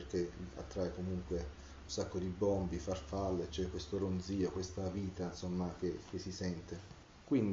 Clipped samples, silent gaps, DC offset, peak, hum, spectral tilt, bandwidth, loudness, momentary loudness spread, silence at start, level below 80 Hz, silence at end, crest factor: under 0.1%; none; under 0.1%; -22 dBFS; none; -7 dB/octave; 7.6 kHz; -40 LUFS; 10 LU; 0 s; -54 dBFS; 0 s; 16 dB